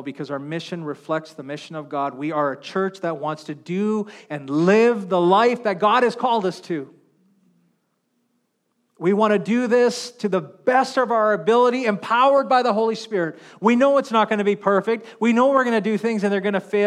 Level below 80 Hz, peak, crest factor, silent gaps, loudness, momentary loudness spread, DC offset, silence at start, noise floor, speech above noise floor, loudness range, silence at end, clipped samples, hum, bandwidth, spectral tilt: -80 dBFS; -4 dBFS; 18 dB; none; -20 LUFS; 13 LU; under 0.1%; 0 s; -71 dBFS; 51 dB; 7 LU; 0 s; under 0.1%; none; 11.5 kHz; -6 dB/octave